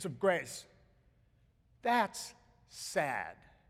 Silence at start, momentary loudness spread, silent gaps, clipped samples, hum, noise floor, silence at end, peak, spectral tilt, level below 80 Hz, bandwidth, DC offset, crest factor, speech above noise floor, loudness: 0 s; 16 LU; none; under 0.1%; none; -69 dBFS; 0.35 s; -16 dBFS; -3.5 dB/octave; -70 dBFS; 16.5 kHz; under 0.1%; 22 dB; 34 dB; -35 LUFS